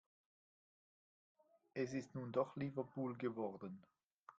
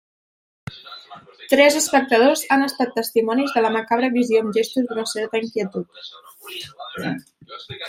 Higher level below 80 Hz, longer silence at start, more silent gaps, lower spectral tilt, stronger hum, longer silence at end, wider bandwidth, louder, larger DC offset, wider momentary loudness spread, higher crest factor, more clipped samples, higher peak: second, -84 dBFS vs -66 dBFS; first, 1.75 s vs 0.7 s; first, 4.13-4.26 s vs none; first, -7.5 dB/octave vs -3.5 dB/octave; neither; about the same, 0.05 s vs 0 s; second, 7.8 kHz vs 16.5 kHz; second, -45 LUFS vs -19 LUFS; neither; second, 11 LU vs 23 LU; about the same, 22 dB vs 20 dB; neither; second, -24 dBFS vs -2 dBFS